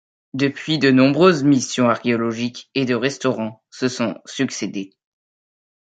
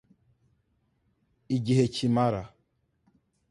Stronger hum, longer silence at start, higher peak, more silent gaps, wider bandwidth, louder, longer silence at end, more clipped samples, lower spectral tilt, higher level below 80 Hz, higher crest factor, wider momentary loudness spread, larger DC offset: neither; second, 0.35 s vs 1.5 s; first, -2 dBFS vs -10 dBFS; neither; second, 9 kHz vs 11.5 kHz; first, -19 LUFS vs -27 LUFS; about the same, 1 s vs 1.05 s; neither; second, -5 dB/octave vs -7 dB/octave; about the same, -64 dBFS vs -60 dBFS; about the same, 18 dB vs 20 dB; about the same, 13 LU vs 11 LU; neither